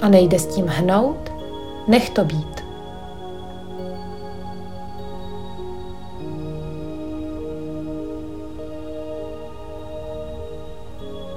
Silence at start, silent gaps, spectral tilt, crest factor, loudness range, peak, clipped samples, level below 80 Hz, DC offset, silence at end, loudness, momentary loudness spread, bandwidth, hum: 0 s; none; -6 dB/octave; 22 dB; 12 LU; -2 dBFS; under 0.1%; -42 dBFS; 2%; 0 s; -25 LUFS; 18 LU; 16.5 kHz; none